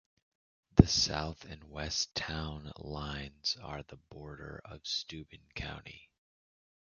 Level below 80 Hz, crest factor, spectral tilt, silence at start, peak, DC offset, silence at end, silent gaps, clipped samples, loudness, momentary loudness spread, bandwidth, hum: -46 dBFS; 32 dB; -4.5 dB/octave; 0.75 s; -4 dBFS; under 0.1%; 0.9 s; none; under 0.1%; -33 LUFS; 22 LU; 7.2 kHz; none